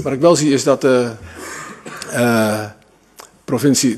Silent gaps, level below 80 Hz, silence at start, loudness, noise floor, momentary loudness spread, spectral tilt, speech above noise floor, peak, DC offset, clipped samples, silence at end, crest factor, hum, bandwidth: none; -54 dBFS; 0 s; -16 LUFS; -44 dBFS; 18 LU; -4.5 dB/octave; 29 dB; 0 dBFS; under 0.1%; under 0.1%; 0 s; 16 dB; none; 14 kHz